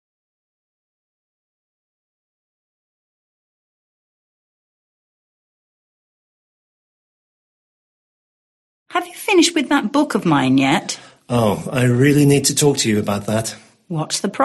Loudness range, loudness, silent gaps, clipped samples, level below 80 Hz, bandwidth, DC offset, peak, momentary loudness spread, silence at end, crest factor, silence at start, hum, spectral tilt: 7 LU; -17 LUFS; none; under 0.1%; -56 dBFS; 12.5 kHz; under 0.1%; -2 dBFS; 11 LU; 0 s; 18 dB; 8.9 s; none; -4.5 dB/octave